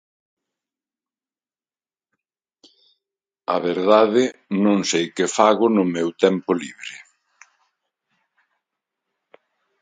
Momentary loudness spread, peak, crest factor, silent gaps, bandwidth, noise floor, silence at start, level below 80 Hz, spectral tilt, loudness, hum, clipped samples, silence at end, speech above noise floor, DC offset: 17 LU; 0 dBFS; 22 dB; none; 9.6 kHz; under -90 dBFS; 3.5 s; -72 dBFS; -4.5 dB/octave; -19 LUFS; none; under 0.1%; 2.8 s; over 71 dB; under 0.1%